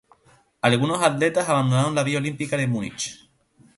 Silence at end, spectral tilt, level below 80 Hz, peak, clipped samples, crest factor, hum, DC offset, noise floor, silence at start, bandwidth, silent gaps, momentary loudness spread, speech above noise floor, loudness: 0.6 s; -5 dB/octave; -60 dBFS; -2 dBFS; under 0.1%; 20 dB; none; under 0.1%; -58 dBFS; 0.65 s; 11.5 kHz; none; 8 LU; 37 dB; -22 LUFS